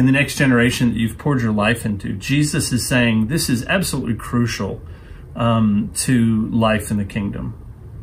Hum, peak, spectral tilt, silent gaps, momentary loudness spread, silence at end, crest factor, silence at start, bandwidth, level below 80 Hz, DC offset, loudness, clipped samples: none; -2 dBFS; -5 dB/octave; none; 13 LU; 0 s; 16 dB; 0 s; 16 kHz; -38 dBFS; under 0.1%; -18 LUFS; under 0.1%